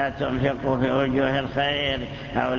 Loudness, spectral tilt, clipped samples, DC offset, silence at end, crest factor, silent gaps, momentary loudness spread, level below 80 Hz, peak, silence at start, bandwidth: -24 LUFS; -7 dB/octave; under 0.1%; under 0.1%; 0 s; 16 dB; none; 5 LU; -42 dBFS; -8 dBFS; 0 s; 7.2 kHz